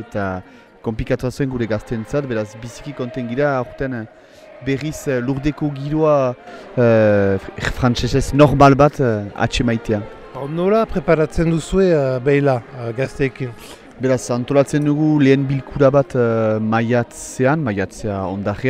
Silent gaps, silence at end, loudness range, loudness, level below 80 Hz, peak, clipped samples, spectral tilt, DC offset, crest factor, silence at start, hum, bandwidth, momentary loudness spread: none; 0 s; 8 LU; -18 LUFS; -36 dBFS; 0 dBFS; under 0.1%; -7 dB/octave; under 0.1%; 18 dB; 0 s; none; 13.5 kHz; 13 LU